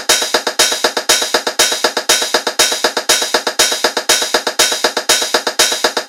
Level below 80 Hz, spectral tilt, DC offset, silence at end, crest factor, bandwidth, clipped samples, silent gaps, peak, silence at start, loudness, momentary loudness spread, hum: -54 dBFS; 1 dB/octave; 0.2%; 0 s; 14 dB; over 20 kHz; 0.1%; none; 0 dBFS; 0 s; -12 LUFS; 3 LU; none